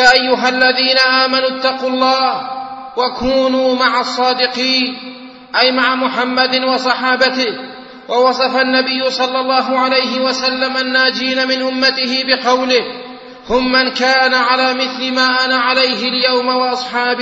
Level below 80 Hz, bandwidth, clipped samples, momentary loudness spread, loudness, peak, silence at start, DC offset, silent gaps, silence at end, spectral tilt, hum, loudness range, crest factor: -50 dBFS; 7.8 kHz; under 0.1%; 8 LU; -13 LUFS; 0 dBFS; 0 s; under 0.1%; none; 0 s; -2.5 dB/octave; none; 2 LU; 14 dB